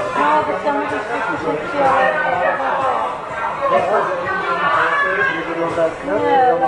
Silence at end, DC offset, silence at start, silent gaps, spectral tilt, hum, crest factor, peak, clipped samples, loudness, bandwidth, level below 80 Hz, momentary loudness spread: 0 s; under 0.1%; 0 s; none; -5 dB/octave; none; 14 dB; -4 dBFS; under 0.1%; -17 LUFS; 11 kHz; -52 dBFS; 6 LU